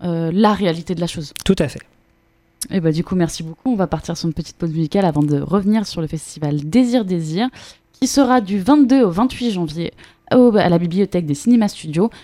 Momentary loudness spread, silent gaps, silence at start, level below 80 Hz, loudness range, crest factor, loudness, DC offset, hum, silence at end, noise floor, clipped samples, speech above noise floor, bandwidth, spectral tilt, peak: 11 LU; none; 0 s; -44 dBFS; 6 LU; 16 dB; -18 LUFS; under 0.1%; none; 0.05 s; -58 dBFS; under 0.1%; 41 dB; 14.5 kHz; -6.5 dB/octave; 0 dBFS